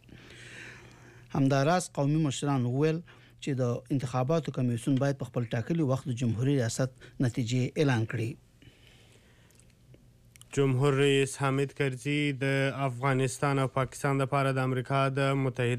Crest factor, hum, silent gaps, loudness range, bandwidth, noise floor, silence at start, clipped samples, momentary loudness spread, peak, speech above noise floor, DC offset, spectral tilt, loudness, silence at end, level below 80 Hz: 14 dB; none; none; 5 LU; 13.5 kHz; -59 dBFS; 0.1 s; under 0.1%; 9 LU; -16 dBFS; 31 dB; under 0.1%; -6 dB/octave; -29 LUFS; 0 s; -62 dBFS